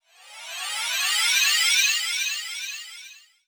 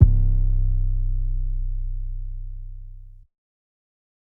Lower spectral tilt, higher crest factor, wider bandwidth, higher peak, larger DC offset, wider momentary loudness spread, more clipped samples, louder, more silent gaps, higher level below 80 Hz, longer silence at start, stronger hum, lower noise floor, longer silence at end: second, 7.5 dB/octave vs -13.5 dB/octave; second, 16 dB vs 22 dB; first, over 20 kHz vs 0.7 kHz; second, -8 dBFS vs 0 dBFS; neither; about the same, 19 LU vs 18 LU; neither; first, -21 LUFS vs -27 LUFS; neither; second, under -90 dBFS vs -22 dBFS; first, 0.25 s vs 0 s; neither; first, -47 dBFS vs -41 dBFS; second, 0.3 s vs 1.15 s